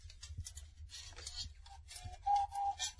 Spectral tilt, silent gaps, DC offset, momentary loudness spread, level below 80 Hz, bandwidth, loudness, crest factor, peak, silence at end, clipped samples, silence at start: -1 dB/octave; none; under 0.1%; 16 LU; -56 dBFS; 11 kHz; -42 LUFS; 18 dB; -24 dBFS; 0 s; under 0.1%; 0 s